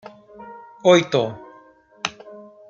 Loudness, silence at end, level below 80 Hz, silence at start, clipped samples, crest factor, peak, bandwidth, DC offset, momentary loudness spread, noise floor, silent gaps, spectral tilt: -20 LUFS; 0.3 s; -66 dBFS; 0.4 s; under 0.1%; 20 dB; -2 dBFS; 7.6 kHz; under 0.1%; 25 LU; -50 dBFS; none; -5 dB/octave